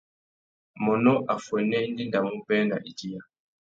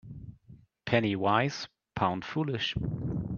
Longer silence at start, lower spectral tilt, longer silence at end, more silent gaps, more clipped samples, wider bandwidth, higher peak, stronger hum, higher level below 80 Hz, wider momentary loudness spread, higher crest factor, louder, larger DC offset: first, 0.75 s vs 0.05 s; about the same, -6.5 dB/octave vs -6 dB/octave; first, 0.55 s vs 0 s; neither; neither; about the same, 7.8 kHz vs 7.2 kHz; about the same, -8 dBFS vs -10 dBFS; neither; second, -70 dBFS vs -52 dBFS; second, 14 LU vs 18 LU; about the same, 18 dB vs 22 dB; first, -26 LUFS vs -30 LUFS; neither